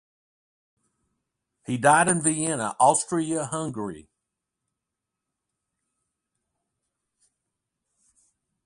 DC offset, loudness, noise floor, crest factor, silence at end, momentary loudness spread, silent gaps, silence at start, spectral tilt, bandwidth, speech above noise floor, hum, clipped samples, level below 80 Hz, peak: under 0.1%; -23 LUFS; -85 dBFS; 24 dB; 4.65 s; 15 LU; none; 1.7 s; -4 dB/octave; 11.5 kHz; 62 dB; none; under 0.1%; -68 dBFS; -4 dBFS